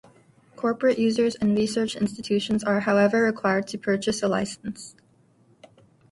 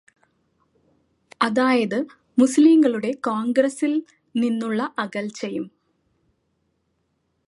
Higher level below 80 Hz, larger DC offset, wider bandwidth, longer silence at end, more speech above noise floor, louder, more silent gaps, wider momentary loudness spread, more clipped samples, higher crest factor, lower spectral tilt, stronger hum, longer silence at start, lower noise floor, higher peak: first, -60 dBFS vs -72 dBFS; neither; about the same, 11.5 kHz vs 11.5 kHz; second, 1.2 s vs 1.8 s; second, 37 dB vs 51 dB; second, -24 LUFS vs -21 LUFS; neither; second, 10 LU vs 14 LU; neither; about the same, 16 dB vs 18 dB; about the same, -5 dB/octave vs -5 dB/octave; neither; second, 0.6 s vs 1.4 s; second, -60 dBFS vs -71 dBFS; second, -8 dBFS vs -4 dBFS